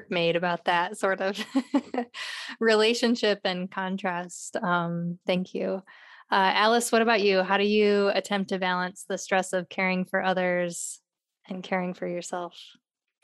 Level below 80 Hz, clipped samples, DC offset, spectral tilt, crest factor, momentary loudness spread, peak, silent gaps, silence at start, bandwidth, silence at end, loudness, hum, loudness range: -80 dBFS; under 0.1%; under 0.1%; -4 dB/octave; 20 dB; 12 LU; -8 dBFS; none; 0 s; 13 kHz; 0.55 s; -26 LUFS; none; 6 LU